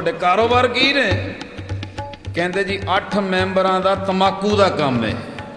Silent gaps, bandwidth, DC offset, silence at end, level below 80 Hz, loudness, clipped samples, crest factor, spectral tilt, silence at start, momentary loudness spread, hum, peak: none; 10.5 kHz; under 0.1%; 0 s; -44 dBFS; -17 LUFS; under 0.1%; 16 dB; -5.5 dB/octave; 0 s; 14 LU; none; -2 dBFS